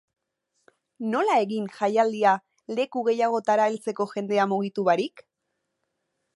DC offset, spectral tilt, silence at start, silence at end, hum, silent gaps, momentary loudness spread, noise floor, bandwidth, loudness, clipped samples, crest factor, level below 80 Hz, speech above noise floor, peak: under 0.1%; -5.5 dB/octave; 1 s; 1.15 s; none; none; 7 LU; -80 dBFS; 11.5 kHz; -25 LUFS; under 0.1%; 18 dB; -82 dBFS; 56 dB; -6 dBFS